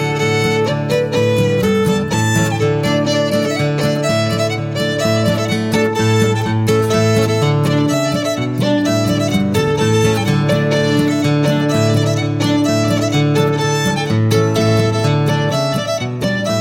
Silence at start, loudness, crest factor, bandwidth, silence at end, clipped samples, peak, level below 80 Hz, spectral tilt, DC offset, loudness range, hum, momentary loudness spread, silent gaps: 0 s; -15 LUFS; 14 dB; 16.5 kHz; 0 s; under 0.1%; -2 dBFS; -44 dBFS; -5.5 dB/octave; under 0.1%; 1 LU; none; 3 LU; none